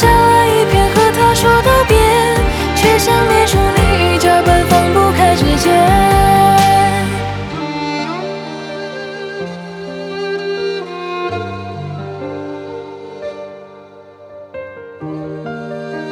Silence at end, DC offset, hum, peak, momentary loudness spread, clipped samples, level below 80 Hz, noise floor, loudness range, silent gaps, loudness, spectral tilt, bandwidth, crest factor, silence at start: 0 s; under 0.1%; none; 0 dBFS; 17 LU; under 0.1%; -26 dBFS; -38 dBFS; 17 LU; none; -12 LUFS; -5 dB/octave; 20 kHz; 12 dB; 0 s